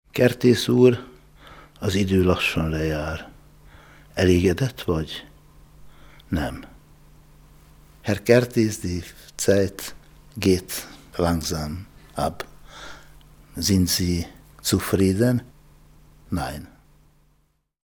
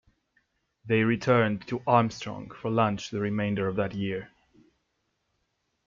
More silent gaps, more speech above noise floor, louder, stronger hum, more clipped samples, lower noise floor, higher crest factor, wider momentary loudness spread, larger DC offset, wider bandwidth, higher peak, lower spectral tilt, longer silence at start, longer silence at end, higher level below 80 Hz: neither; second, 45 dB vs 50 dB; first, -22 LUFS vs -27 LUFS; neither; neither; second, -66 dBFS vs -77 dBFS; about the same, 24 dB vs 22 dB; first, 19 LU vs 11 LU; neither; first, over 20 kHz vs 7.4 kHz; first, 0 dBFS vs -6 dBFS; second, -5.5 dB/octave vs -7 dB/octave; second, 0.15 s vs 0.85 s; second, 1.2 s vs 1.6 s; first, -46 dBFS vs -62 dBFS